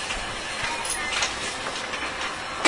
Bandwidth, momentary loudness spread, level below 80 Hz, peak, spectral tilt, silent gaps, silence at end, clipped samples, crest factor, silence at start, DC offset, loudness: 11 kHz; 5 LU; -46 dBFS; -2 dBFS; -1 dB/octave; none; 0 s; under 0.1%; 26 dB; 0 s; under 0.1%; -27 LUFS